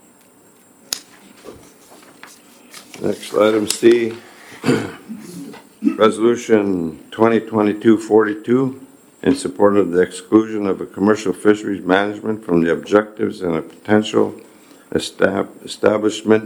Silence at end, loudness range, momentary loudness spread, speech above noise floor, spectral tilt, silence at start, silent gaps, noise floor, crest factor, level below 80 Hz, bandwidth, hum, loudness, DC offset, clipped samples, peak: 0 s; 3 LU; 12 LU; 33 dB; -5.5 dB/octave; 0.9 s; none; -49 dBFS; 18 dB; -60 dBFS; 19 kHz; none; -18 LUFS; under 0.1%; under 0.1%; 0 dBFS